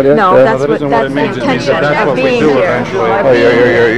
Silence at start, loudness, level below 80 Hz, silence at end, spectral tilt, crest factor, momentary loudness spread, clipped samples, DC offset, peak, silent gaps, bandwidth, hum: 0 s; -10 LUFS; -40 dBFS; 0 s; -6.5 dB/octave; 10 dB; 6 LU; under 0.1%; 1%; 0 dBFS; none; 11 kHz; none